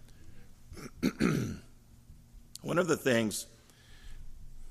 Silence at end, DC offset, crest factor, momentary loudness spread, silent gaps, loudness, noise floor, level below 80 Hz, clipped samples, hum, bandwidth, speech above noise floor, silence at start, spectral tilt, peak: 0 s; under 0.1%; 22 dB; 25 LU; none; -32 LUFS; -55 dBFS; -52 dBFS; under 0.1%; none; 15.5 kHz; 26 dB; 0.05 s; -5 dB/octave; -14 dBFS